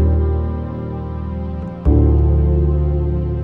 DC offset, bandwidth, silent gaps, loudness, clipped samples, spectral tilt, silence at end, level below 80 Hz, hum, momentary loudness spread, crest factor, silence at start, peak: under 0.1%; 2.8 kHz; none; -18 LUFS; under 0.1%; -12.5 dB/octave; 0 s; -18 dBFS; none; 11 LU; 14 dB; 0 s; -2 dBFS